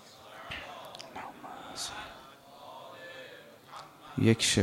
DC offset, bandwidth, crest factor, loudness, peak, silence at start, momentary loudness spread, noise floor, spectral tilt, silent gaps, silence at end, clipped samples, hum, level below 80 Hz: under 0.1%; 16 kHz; 24 dB; -34 LUFS; -10 dBFS; 0 s; 22 LU; -52 dBFS; -4 dB/octave; none; 0 s; under 0.1%; none; -62 dBFS